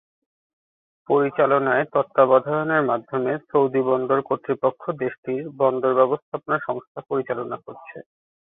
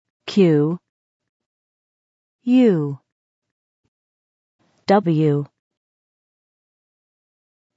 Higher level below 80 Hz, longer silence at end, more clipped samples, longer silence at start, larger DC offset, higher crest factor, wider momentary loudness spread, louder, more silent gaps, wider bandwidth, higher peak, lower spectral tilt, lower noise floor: about the same, -70 dBFS vs -74 dBFS; second, 0.45 s vs 2.3 s; neither; first, 1.1 s vs 0.25 s; neither; about the same, 20 dB vs 18 dB; second, 11 LU vs 16 LU; second, -22 LUFS vs -18 LUFS; second, 5.18-5.23 s, 6.22-6.32 s, 6.87-6.95 s vs 0.89-1.20 s, 1.29-1.40 s, 1.46-2.39 s, 3.12-3.42 s, 3.51-4.59 s; second, 3.9 kHz vs 7.8 kHz; about the same, -4 dBFS vs -4 dBFS; first, -11 dB/octave vs -8.5 dB/octave; about the same, under -90 dBFS vs under -90 dBFS